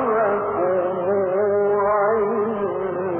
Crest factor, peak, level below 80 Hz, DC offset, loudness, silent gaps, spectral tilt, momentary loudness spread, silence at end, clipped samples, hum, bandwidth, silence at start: 10 dB; -10 dBFS; -58 dBFS; under 0.1%; -21 LUFS; none; -11 dB/octave; 5 LU; 0 s; under 0.1%; none; 3.3 kHz; 0 s